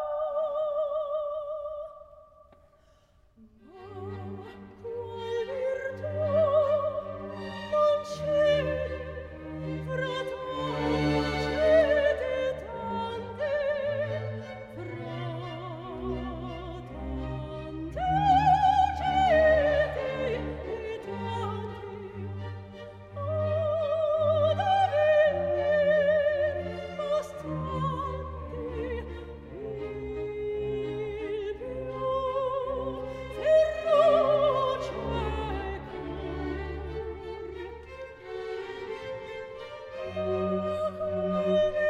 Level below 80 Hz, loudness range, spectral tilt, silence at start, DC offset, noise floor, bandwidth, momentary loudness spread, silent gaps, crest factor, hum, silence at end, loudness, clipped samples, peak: -46 dBFS; 12 LU; -6.5 dB/octave; 0 s; under 0.1%; -62 dBFS; 9.4 kHz; 17 LU; none; 18 dB; none; 0 s; -29 LUFS; under 0.1%; -10 dBFS